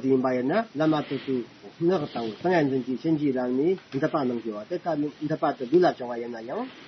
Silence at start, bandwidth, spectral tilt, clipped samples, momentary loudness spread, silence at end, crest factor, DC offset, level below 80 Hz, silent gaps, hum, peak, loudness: 0 s; 6.2 kHz; -6 dB/octave; under 0.1%; 10 LU; 0 s; 16 dB; under 0.1%; -70 dBFS; none; none; -10 dBFS; -26 LUFS